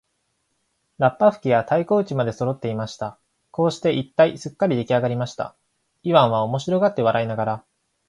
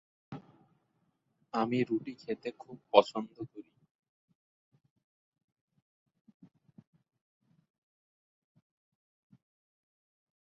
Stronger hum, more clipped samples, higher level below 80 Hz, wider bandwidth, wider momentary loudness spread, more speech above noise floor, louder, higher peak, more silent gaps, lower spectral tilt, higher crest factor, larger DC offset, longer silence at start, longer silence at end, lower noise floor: neither; neither; first, -62 dBFS vs -80 dBFS; first, 11 kHz vs 7.4 kHz; second, 13 LU vs 23 LU; first, 51 dB vs 45 dB; first, -21 LUFS vs -32 LUFS; first, 0 dBFS vs -6 dBFS; neither; first, -6.5 dB/octave vs -4 dB/octave; second, 22 dB vs 32 dB; neither; first, 1 s vs 0.3 s; second, 0.5 s vs 6.9 s; second, -72 dBFS vs -77 dBFS